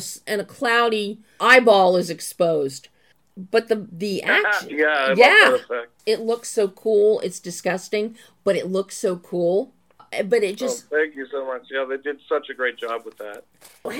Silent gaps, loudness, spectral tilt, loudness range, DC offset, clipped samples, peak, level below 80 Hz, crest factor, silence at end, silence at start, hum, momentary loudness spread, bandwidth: none; -20 LUFS; -3.5 dB/octave; 7 LU; under 0.1%; under 0.1%; 0 dBFS; -72 dBFS; 20 dB; 0 s; 0 s; none; 16 LU; 17.5 kHz